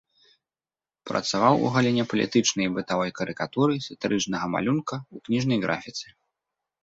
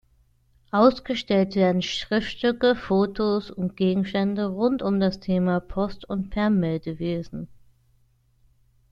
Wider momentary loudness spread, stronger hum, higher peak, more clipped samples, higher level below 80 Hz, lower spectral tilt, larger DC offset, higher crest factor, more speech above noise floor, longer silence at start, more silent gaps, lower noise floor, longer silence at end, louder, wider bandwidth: first, 12 LU vs 9 LU; neither; about the same, -4 dBFS vs -4 dBFS; neither; second, -62 dBFS vs -50 dBFS; second, -4.5 dB/octave vs -7 dB/octave; neither; about the same, 22 dB vs 20 dB; first, over 65 dB vs 39 dB; first, 1.05 s vs 0.75 s; neither; first, under -90 dBFS vs -62 dBFS; second, 0.8 s vs 1.45 s; about the same, -25 LUFS vs -24 LUFS; about the same, 8 kHz vs 7.6 kHz